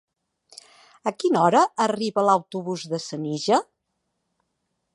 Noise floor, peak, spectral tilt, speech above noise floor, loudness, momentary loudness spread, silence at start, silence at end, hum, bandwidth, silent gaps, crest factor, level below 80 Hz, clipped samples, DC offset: -77 dBFS; -6 dBFS; -5 dB/octave; 55 dB; -23 LUFS; 12 LU; 1.05 s; 1.35 s; none; 11.5 kHz; none; 20 dB; -76 dBFS; under 0.1%; under 0.1%